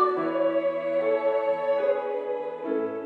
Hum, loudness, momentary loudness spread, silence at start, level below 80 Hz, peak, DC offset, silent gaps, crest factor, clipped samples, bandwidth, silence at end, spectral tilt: none; -26 LUFS; 6 LU; 0 s; -80 dBFS; -10 dBFS; under 0.1%; none; 14 dB; under 0.1%; 4.7 kHz; 0 s; -7 dB/octave